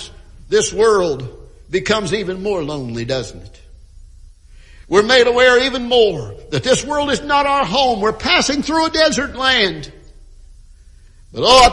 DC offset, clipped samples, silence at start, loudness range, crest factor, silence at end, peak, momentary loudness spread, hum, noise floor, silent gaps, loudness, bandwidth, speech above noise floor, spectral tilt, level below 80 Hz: under 0.1%; under 0.1%; 0 s; 8 LU; 16 dB; 0 s; 0 dBFS; 13 LU; none; -43 dBFS; none; -15 LUFS; 12 kHz; 28 dB; -3 dB/octave; -38 dBFS